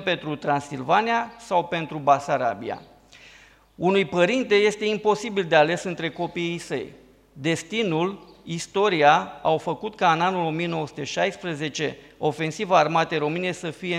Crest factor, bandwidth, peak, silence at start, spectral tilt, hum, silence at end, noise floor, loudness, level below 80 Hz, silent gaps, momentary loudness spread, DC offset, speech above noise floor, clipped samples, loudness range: 20 dB; 12.5 kHz; -4 dBFS; 0 s; -5 dB/octave; none; 0 s; -52 dBFS; -23 LUFS; -62 dBFS; none; 11 LU; under 0.1%; 29 dB; under 0.1%; 3 LU